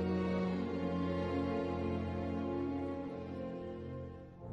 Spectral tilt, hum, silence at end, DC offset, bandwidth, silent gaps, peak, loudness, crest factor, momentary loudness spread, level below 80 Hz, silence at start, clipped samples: -8.5 dB/octave; none; 0 s; under 0.1%; 7.8 kHz; none; -24 dBFS; -38 LUFS; 14 dB; 9 LU; -62 dBFS; 0 s; under 0.1%